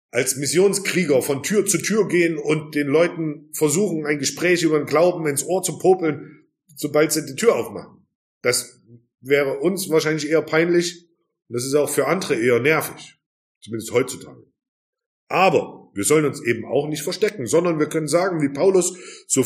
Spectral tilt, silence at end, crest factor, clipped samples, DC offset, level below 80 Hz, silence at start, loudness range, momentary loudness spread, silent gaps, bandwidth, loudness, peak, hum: -4 dB/octave; 0 s; 18 dB; under 0.1%; under 0.1%; -68 dBFS; 0.15 s; 3 LU; 10 LU; 8.15-8.41 s, 13.26-13.61 s, 14.68-14.93 s, 15.06-15.27 s; 15.5 kHz; -20 LUFS; -2 dBFS; none